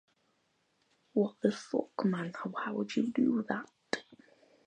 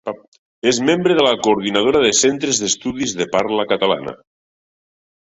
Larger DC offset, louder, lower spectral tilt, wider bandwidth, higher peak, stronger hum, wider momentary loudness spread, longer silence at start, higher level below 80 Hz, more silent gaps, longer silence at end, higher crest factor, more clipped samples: neither; second, -34 LUFS vs -16 LUFS; first, -6.5 dB/octave vs -3 dB/octave; first, 9.8 kHz vs 8.4 kHz; second, -14 dBFS vs -2 dBFS; neither; about the same, 9 LU vs 8 LU; first, 1.15 s vs 0.05 s; second, -82 dBFS vs -54 dBFS; second, none vs 0.28-0.32 s, 0.39-0.62 s; second, 0.5 s vs 1.05 s; first, 22 dB vs 16 dB; neither